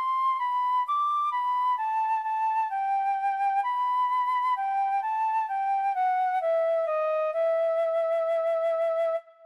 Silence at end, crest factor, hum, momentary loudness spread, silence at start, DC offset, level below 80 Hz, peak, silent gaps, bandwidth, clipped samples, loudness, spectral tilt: 0.25 s; 8 dB; none; 2 LU; 0 s; under 0.1%; -86 dBFS; -18 dBFS; none; 12 kHz; under 0.1%; -26 LUFS; -0.5 dB/octave